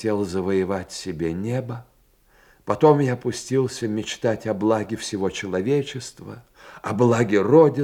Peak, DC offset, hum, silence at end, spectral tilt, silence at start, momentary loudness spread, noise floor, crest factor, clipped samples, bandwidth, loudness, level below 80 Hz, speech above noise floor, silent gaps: -2 dBFS; under 0.1%; none; 0 s; -6 dB/octave; 0 s; 18 LU; -58 dBFS; 20 dB; under 0.1%; 15 kHz; -22 LUFS; -58 dBFS; 37 dB; none